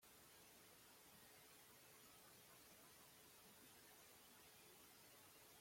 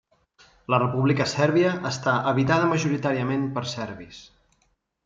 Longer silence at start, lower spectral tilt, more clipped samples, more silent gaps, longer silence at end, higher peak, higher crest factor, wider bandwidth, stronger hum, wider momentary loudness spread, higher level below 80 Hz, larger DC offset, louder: second, 0 s vs 0.7 s; second, -1.5 dB/octave vs -6 dB/octave; neither; neither; second, 0 s vs 0.8 s; second, -54 dBFS vs -4 dBFS; second, 14 dB vs 20 dB; first, 16.5 kHz vs 7.8 kHz; neither; second, 1 LU vs 13 LU; second, -90 dBFS vs -60 dBFS; neither; second, -65 LUFS vs -23 LUFS